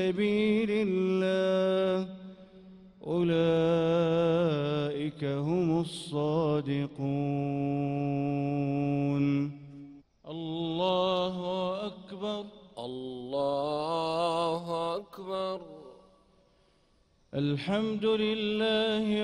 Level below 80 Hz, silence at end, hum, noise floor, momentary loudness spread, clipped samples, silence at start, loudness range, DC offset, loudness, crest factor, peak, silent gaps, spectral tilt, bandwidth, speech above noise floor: -64 dBFS; 0 s; none; -67 dBFS; 13 LU; under 0.1%; 0 s; 5 LU; under 0.1%; -30 LUFS; 14 dB; -16 dBFS; none; -7 dB/octave; 11 kHz; 38 dB